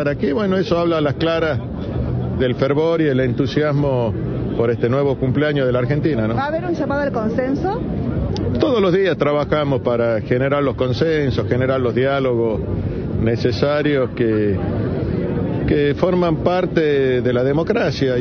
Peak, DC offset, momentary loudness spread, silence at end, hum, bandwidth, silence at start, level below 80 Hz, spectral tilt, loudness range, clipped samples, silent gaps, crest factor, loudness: -2 dBFS; under 0.1%; 5 LU; 0 s; none; 6.6 kHz; 0 s; -36 dBFS; -8 dB/octave; 1 LU; under 0.1%; none; 16 dB; -18 LUFS